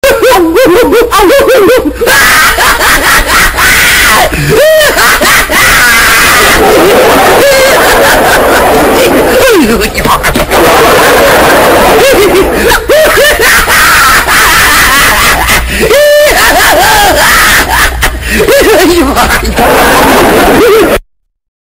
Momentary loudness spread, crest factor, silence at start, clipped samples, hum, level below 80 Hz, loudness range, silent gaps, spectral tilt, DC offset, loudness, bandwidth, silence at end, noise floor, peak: 4 LU; 4 dB; 0.05 s; 1%; none; -20 dBFS; 2 LU; none; -2.5 dB/octave; 2%; -3 LUFS; over 20 kHz; 0.65 s; -30 dBFS; 0 dBFS